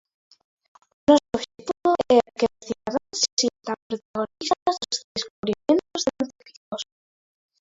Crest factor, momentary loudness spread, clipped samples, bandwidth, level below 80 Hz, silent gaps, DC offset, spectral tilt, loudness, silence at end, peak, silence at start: 22 dB; 14 LU; under 0.1%; 8 kHz; -60 dBFS; 3.33-3.37 s, 3.82-3.90 s, 4.05-4.14 s, 4.62-4.66 s, 5.04-5.15 s, 5.30-5.43 s, 6.57-6.72 s; under 0.1%; -3 dB/octave; -24 LUFS; 0.9 s; -4 dBFS; 1.1 s